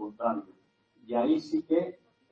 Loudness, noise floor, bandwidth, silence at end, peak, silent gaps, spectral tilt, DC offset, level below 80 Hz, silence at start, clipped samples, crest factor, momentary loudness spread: -30 LUFS; -66 dBFS; 7.2 kHz; 0.35 s; -14 dBFS; none; -7 dB/octave; under 0.1%; -74 dBFS; 0 s; under 0.1%; 16 dB; 9 LU